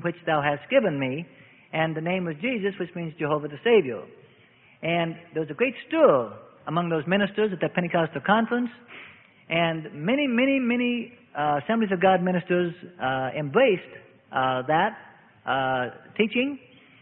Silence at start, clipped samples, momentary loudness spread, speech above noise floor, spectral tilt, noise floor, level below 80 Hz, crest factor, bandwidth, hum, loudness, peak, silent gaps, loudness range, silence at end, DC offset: 0 s; under 0.1%; 12 LU; 32 dB; -10.5 dB/octave; -56 dBFS; -66 dBFS; 20 dB; 4.1 kHz; none; -25 LUFS; -6 dBFS; none; 3 LU; 0.45 s; under 0.1%